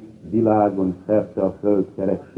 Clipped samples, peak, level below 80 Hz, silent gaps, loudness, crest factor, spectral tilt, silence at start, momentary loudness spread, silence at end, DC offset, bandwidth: under 0.1%; -4 dBFS; -56 dBFS; none; -21 LUFS; 16 dB; -11 dB/octave; 0 s; 7 LU; 0.15 s; under 0.1%; 4.2 kHz